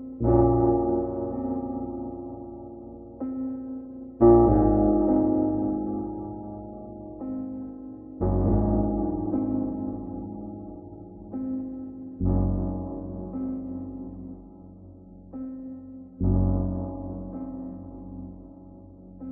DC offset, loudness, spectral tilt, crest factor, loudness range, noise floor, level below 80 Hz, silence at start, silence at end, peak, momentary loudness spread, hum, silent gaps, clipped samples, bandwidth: under 0.1%; -26 LUFS; -15.5 dB/octave; 20 dB; 10 LU; -46 dBFS; -38 dBFS; 0 s; 0 s; -6 dBFS; 21 LU; none; none; under 0.1%; 2.1 kHz